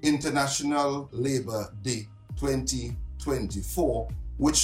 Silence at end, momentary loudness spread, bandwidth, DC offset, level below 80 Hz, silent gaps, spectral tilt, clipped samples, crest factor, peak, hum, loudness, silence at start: 0 s; 9 LU; 16 kHz; under 0.1%; -40 dBFS; none; -4 dB/octave; under 0.1%; 18 dB; -10 dBFS; none; -29 LUFS; 0 s